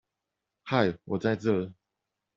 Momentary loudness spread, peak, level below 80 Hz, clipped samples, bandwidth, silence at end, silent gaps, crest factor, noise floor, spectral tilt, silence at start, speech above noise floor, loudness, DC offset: 11 LU; -8 dBFS; -66 dBFS; under 0.1%; 7.6 kHz; 0.65 s; none; 22 dB; -86 dBFS; -5.5 dB/octave; 0.65 s; 58 dB; -29 LUFS; under 0.1%